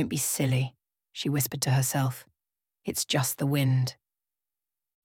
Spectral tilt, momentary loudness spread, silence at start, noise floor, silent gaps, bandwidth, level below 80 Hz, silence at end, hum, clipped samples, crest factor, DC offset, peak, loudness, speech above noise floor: -4.5 dB/octave; 10 LU; 0 s; under -90 dBFS; none; 17.5 kHz; -64 dBFS; 1.1 s; none; under 0.1%; 18 dB; under 0.1%; -12 dBFS; -28 LUFS; over 63 dB